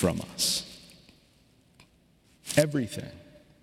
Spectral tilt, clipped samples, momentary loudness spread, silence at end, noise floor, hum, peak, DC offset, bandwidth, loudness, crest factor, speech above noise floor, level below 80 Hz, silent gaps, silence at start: -4 dB/octave; under 0.1%; 20 LU; 0.4 s; -63 dBFS; none; -6 dBFS; under 0.1%; 17 kHz; -28 LUFS; 26 dB; 35 dB; -58 dBFS; none; 0 s